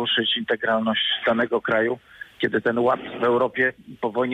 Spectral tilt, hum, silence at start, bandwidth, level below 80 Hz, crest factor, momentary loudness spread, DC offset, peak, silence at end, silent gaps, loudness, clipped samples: -6 dB/octave; none; 0 s; 9 kHz; -62 dBFS; 14 dB; 7 LU; under 0.1%; -10 dBFS; 0 s; none; -22 LUFS; under 0.1%